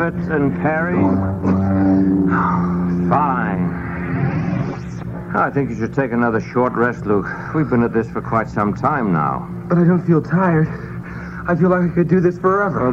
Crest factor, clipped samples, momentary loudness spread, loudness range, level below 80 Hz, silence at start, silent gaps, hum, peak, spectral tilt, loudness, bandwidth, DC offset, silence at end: 16 dB; under 0.1%; 8 LU; 3 LU; -40 dBFS; 0 s; none; none; -2 dBFS; -10 dB/octave; -18 LUFS; 6.8 kHz; under 0.1%; 0 s